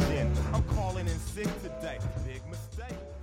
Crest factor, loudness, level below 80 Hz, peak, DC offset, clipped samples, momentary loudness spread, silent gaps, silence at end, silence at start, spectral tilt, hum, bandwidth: 16 dB; -33 LUFS; -36 dBFS; -16 dBFS; under 0.1%; under 0.1%; 11 LU; none; 0 s; 0 s; -6.5 dB/octave; none; 16 kHz